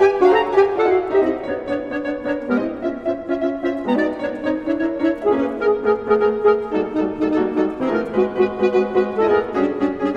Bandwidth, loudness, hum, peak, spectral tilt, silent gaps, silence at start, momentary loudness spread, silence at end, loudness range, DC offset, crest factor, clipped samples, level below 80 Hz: 7 kHz; -19 LUFS; none; -2 dBFS; -7 dB/octave; none; 0 s; 8 LU; 0 s; 3 LU; under 0.1%; 16 dB; under 0.1%; -50 dBFS